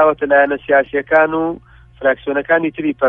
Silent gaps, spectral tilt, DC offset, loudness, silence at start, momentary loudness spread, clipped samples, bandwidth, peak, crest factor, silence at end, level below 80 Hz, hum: none; -8.5 dB/octave; under 0.1%; -15 LUFS; 0 s; 7 LU; under 0.1%; 3.8 kHz; 0 dBFS; 14 dB; 0 s; -48 dBFS; none